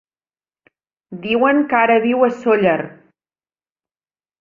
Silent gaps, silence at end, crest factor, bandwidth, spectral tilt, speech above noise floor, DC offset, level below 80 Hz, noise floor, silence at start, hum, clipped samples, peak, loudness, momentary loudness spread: none; 1.5 s; 18 dB; 7.4 kHz; -7 dB/octave; over 75 dB; under 0.1%; -64 dBFS; under -90 dBFS; 1.1 s; none; under 0.1%; 0 dBFS; -16 LUFS; 16 LU